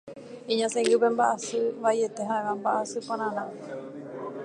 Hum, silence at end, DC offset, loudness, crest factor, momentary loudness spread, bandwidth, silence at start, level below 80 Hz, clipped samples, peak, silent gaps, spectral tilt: none; 0 s; under 0.1%; -27 LUFS; 18 dB; 16 LU; 11 kHz; 0.05 s; -78 dBFS; under 0.1%; -10 dBFS; none; -3.5 dB/octave